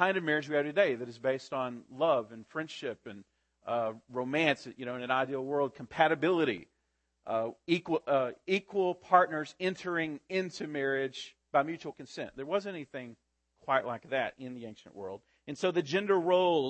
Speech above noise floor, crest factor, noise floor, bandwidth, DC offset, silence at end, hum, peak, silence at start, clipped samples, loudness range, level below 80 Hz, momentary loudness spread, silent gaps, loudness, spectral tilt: 47 dB; 22 dB; -79 dBFS; 8.6 kHz; under 0.1%; 0 s; none; -10 dBFS; 0 s; under 0.1%; 5 LU; -76 dBFS; 17 LU; none; -32 LUFS; -5.5 dB/octave